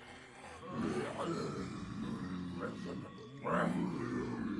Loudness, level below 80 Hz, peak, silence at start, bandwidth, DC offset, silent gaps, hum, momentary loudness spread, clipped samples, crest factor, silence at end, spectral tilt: -40 LUFS; -64 dBFS; -22 dBFS; 0 s; 11.5 kHz; under 0.1%; none; none; 14 LU; under 0.1%; 18 dB; 0 s; -6.5 dB/octave